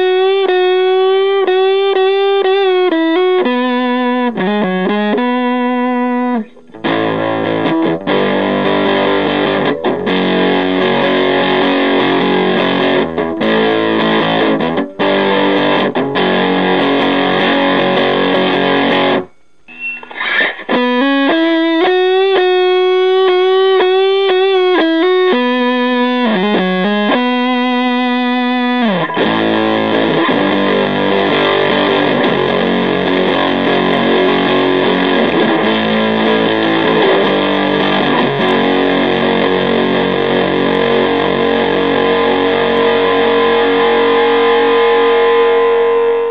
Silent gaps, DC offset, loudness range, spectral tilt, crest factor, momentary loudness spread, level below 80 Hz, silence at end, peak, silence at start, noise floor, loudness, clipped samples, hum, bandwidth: none; 0.8%; 3 LU; -7.5 dB/octave; 12 dB; 4 LU; -58 dBFS; 0 s; 0 dBFS; 0 s; -41 dBFS; -12 LUFS; under 0.1%; none; 6.2 kHz